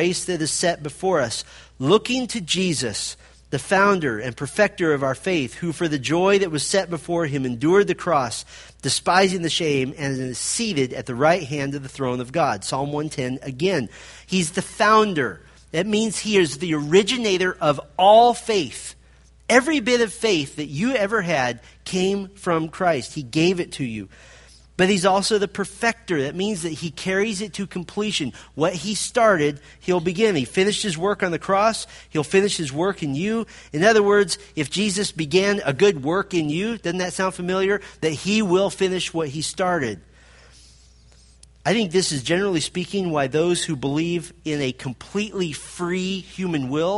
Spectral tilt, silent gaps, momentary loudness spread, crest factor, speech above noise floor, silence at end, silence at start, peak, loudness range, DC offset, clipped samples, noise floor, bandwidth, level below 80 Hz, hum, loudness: -4 dB/octave; none; 10 LU; 20 dB; 30 dB; 0 s; 0 s; -2 dBFS; 5 LU; under 0.1%; under 0.1%; -51 dBFS; 11.5 kHz; -52 dBFS; none; -21 LUFS